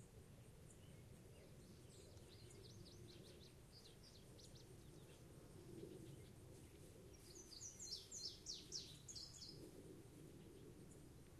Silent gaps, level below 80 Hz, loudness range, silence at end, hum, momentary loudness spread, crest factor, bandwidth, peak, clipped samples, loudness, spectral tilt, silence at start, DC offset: none; -72 dBFS; 8 LU; 0 s; none; 12 LU; 22 dB; 13 kHz; -38 dBFS; under 0.1%; -58 LUFS; -3.5 dB/octave; 0 s; under 0.1%